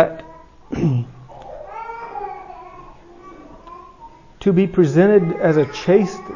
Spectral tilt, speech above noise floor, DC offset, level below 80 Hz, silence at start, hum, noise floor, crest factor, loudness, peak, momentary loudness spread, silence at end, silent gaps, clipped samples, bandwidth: -8 dB/octave; 27 dB; under 0.1%; -48 dBFS; 0 s; none; -43 dBFS; 20 dB; -17 LUFS; 0 dBFS; 25 LU; 0 s; none; under 0.1%; 7.4 kHz